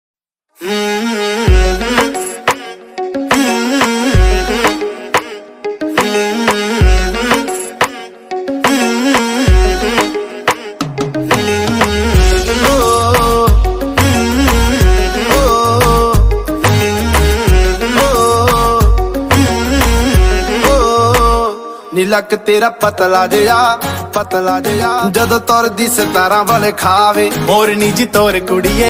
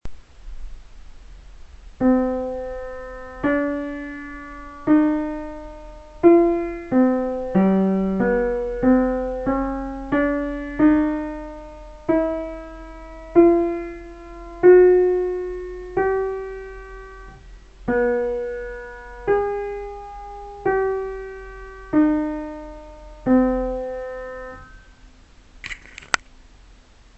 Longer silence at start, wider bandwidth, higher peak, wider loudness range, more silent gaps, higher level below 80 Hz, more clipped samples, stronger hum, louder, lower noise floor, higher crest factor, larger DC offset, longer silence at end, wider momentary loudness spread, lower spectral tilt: first, 0.6 s vs 0.05 s; first, 16.5 kHz vs 8.4 kHz; about the same, 0 dBFS vs 0 dBFS; second, 3 LU vs 8 LU; neither; first, -18 dBFS vs -40 dBFS; neither; neither; first, -12 LUFS vs -21 LUFS; second, -37 dBFS vs -49 dBFS; second, 12 dB vs 22 dB; neither; second, 0 s vs 1 s; second, 7 LU vs 21 LU; second, -4.5 dB/octave vs -7 dB/octave